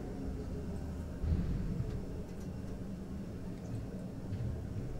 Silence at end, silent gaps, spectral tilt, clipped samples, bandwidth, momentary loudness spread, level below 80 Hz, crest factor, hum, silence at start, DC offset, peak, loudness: 0 s; none; -8.5 dB/octave; under 0.1%; 15.5 kHz; 8 LU; -44 dBFS; 18 dB; none; 0 s; under 0.1%; -22 dBFS; -41 LUFS